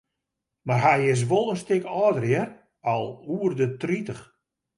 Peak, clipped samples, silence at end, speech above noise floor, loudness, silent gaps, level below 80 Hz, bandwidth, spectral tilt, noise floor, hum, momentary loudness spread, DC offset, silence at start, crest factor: -6 dBFS; under 0.1%; 0.55 s; 60 dB; -24 LUFS; none; -66 dBFS; 11.5 kHz; -6.5 dB/octave; -84 dBFS; none; 12 LU; under 0.1%; 0.65 s; 18 dB